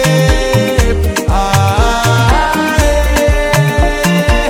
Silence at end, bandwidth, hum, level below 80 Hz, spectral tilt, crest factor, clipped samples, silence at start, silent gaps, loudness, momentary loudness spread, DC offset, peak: 0 s; 18.5 kHz; none; -16 dBFS; -5 dB/octave; 10 dB; under 0.1%; 0 s; none; -11 LUFS; 2 LU; under 0.1%; 0 dBFS